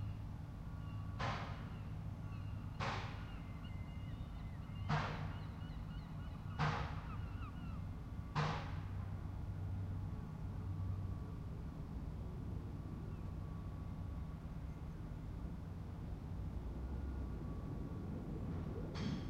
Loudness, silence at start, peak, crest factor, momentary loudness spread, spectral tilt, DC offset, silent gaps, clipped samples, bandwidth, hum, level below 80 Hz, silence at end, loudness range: -46 LUFS; 0 s; -24 dBFS; 20 dB; 8 LU; -7 dB/octave; under 0.1%; none; under 0.1%; 9.8 kHz; none; -50 dBFS; 0 s; 4 LU